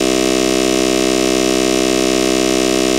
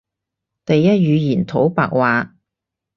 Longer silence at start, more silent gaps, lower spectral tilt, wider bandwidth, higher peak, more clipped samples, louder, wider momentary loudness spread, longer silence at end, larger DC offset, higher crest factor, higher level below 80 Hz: second, 0 s vs 0.7 s; neither; second, -3 dB/octave vs -8.5 dB/octave; first, 16 kHz vs 6.8 kHz; about the same, -4 dBFS vs -2 dBFS; neither; about the same, -14 LUFS vs -16 LUFS; second, 0 LU vs 8 LU; second, 0 s vs 0.7 s; first, 0.9% vs under 0.1%; second, 10 dB vs 16 dB; first, -38 dBFS vs -54 dBFS